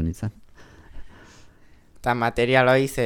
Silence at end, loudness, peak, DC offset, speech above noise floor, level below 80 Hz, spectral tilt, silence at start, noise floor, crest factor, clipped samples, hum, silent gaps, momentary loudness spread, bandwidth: 0 s; -21 LUFS; -4 dBFS; under 0.1%; 30 dB; -44 dBFS; -5.5 dB/octave; 0 s; -51 dBFS; 20 dB; under 0.1%; none; none; 15 LU; 19 kHz